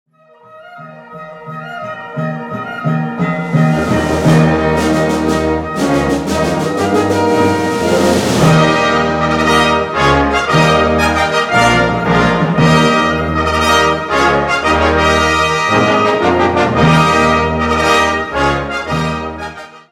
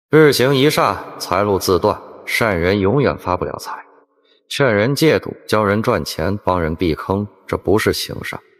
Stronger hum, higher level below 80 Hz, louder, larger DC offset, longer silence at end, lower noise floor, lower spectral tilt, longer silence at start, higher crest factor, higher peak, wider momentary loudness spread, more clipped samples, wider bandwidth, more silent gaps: neither; first, -30 dBFS vs -42 dBFS; first, -12 LUFS vs -17 LUFS; neither; about the same, 0.1 s vs 0.2 s; second, -42 dBFS vs -57 dBFS; about the same, -5.5 dB/octave vs -5.5 dB/octave; first, 0.55 s vs 0.1 s; about the same, 12 dB vs 16 dB; about the same, 0 dBFS vs 0 dBFS; about the same, 11 LU vs 11 LU; neither; about the same, 15 kHz vs 15.5 kHz; neither